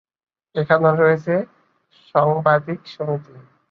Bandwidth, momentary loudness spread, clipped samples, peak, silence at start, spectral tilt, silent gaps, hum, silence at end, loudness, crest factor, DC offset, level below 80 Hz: 6.4 kHz; 13 LU; under 0.1%; 0 dBFS; 0.55 s; -9 dB/octave; none; none; 0.3 s; -19 LUFS; 20 dB; under 0.1%; -62 dBFS